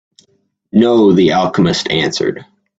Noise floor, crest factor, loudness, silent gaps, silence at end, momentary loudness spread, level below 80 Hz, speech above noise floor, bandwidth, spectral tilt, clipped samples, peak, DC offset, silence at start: -60 dBFS; 14 dB; -13 LUFS; none; 0.35 s; 9 LU; -48 dBFS; 48 dB; 8 kHz; -5.5 dB/octave; under 0.1%; 0 dBFS; under 0.1%; 0.75 s